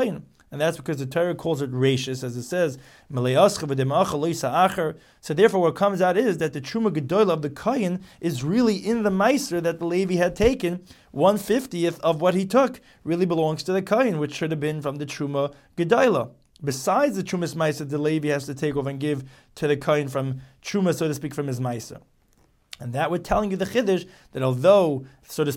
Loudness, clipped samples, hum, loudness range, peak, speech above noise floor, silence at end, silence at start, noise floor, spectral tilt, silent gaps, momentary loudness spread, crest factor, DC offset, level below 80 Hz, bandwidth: -23 LUFS; under 0.1%; none; 5 LU; -4 dBFS; 38 dB; 0 s; 0 s; -61 dBFS; -6 dB/octave; none; 10 LU; 20 dB; under 0.1%; -50 dBFS; 17 kHz